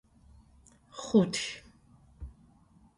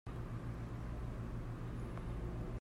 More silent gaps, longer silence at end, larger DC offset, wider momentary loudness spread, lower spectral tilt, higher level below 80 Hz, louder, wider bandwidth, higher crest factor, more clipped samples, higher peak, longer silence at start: neither; first, 0.7 s vs 0 s; neither; first, 24 LU vs 1 LU; second, -5 dB/octave vs -8 dB/octave; second, -56 dBFS vs -48 dBFS; first, -29 LUFS vs -46 LUFS; about the same, 11.5 kHz vs 12 kHz; first, 22 dB vs 12 dB; neither; first, -12 dBFS vs -32 dBFS; first, 0.95 s vs 0.05 s